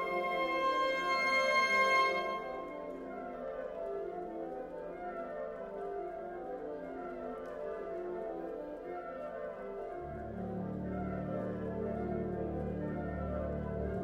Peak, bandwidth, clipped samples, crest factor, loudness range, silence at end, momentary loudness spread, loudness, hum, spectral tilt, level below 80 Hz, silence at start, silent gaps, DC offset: -20 dBFS; 16 kHz; under 0.1%; 18 dB; 10 LU; 0 s; 14 LU; -36 LUFS; none; -5.5 dB/octave; -54 dBFS; 0 s; none; under 0.1%